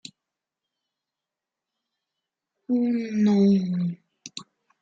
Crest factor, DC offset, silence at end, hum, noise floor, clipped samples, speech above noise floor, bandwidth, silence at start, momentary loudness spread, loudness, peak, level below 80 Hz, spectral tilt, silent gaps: 16 dB; under 0.1%; 0.4 s; none; -88 dBFS; under 0.1%; 66 dB; 7.8 kHz; 2.7 s; 20 LU; -23 LUFS; -12 dBFS; -72 dBFS; -7.5 dB/octave; none